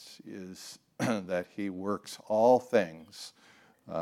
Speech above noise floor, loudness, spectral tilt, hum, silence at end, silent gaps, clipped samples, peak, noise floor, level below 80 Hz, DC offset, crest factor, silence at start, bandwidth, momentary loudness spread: 20 dB; -30 LUFS; -5.5 dB/octave; none; 0 s; none; under 0.1%; -12 dBFS; -50 dBFS; -80 dBFS; under 0.1%; 20 dB; 0 s; 15.5 kHz; 21 LU